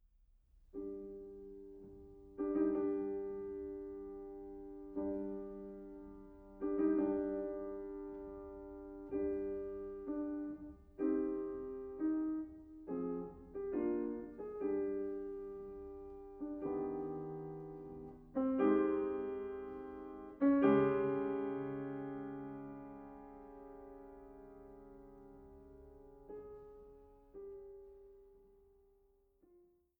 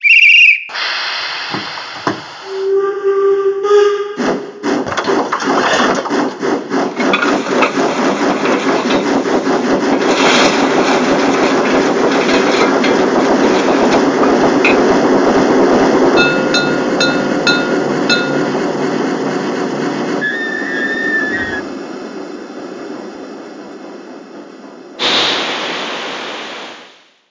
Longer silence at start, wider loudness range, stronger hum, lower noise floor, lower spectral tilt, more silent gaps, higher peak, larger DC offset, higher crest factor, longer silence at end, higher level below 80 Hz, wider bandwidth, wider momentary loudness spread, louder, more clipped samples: first, 0.55 s vs 0 s; first, 20 LU vs 8 LU; neither; first, -73 dBFS vs -42 dBFS; first, -10 dB/octave vs -4 dB/octave; neither; second, -20 dBFS vs 0 dBFS; neither; first, 22 dB vs 14 dB; about the same, 0.4 s vs 0.45 s; second, -64 dBFS vs -48 dBFS; second, 3.4 kHz vs 7.6 kHz; first, 22 LU vs 16 LU; second, -40 LUFS vs -13 LUFS; neither